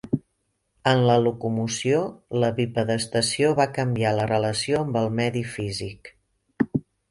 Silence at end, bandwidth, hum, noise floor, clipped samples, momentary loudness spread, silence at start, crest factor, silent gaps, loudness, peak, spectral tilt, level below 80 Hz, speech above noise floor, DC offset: 0.3 s; 11.5 kHz; none; -74 dBFS; under 0.1%; 9 LU; 0.05 s; 18 dB; none; -24 LUFS; -6 dBFS; -5.5 dB/octave; -56 dBFS; 51 dB; under 0.1%